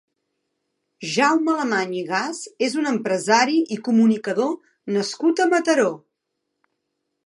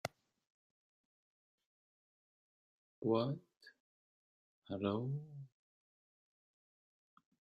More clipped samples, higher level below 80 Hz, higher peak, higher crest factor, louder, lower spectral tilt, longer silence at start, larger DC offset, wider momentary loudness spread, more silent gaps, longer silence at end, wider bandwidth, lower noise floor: neither; about the same, -78 dBFS vs -82 dBFS; first, -2 dBFS vs -22 dBFS; second, 20 dB vs 26 dB; first, -21 LUFS vs -40 LUFS; second, -4 dB/octave vs -6.5 dB/octave; first, 1 s vs 0.05 s; neither; second, 8 LU vs 18 LU; second, none vs 0.50-1.58 s, 1.66-3.02 s, 3.57-3.61 s, 3.80-4.62 s; second, 1.3 s vs 2.05 s; first, 11.5 kHz vs 8 kHz; second, -78 dBFS vs under -90 dBFS